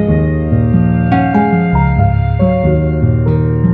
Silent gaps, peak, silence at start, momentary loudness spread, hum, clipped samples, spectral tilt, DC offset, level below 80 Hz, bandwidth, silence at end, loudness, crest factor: none; 0 dBFS; 0 s; 2 LU; none; under 0.1%; -12 dB/octave; under 0.1%; -22 dBFS; 4.5 kHz; 0 s; -12 LUFS; 10 dB